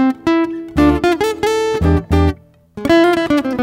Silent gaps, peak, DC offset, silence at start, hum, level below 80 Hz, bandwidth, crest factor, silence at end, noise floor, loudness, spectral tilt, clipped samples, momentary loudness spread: none; -2 dBFS; under 0.1%; 0 s; none; -28 dBFS; 16 kHz; 14 dB; 0 s; -34 dBFS; -15 LUFS; -6.5 dB/octave; under 0.1%; 6 LU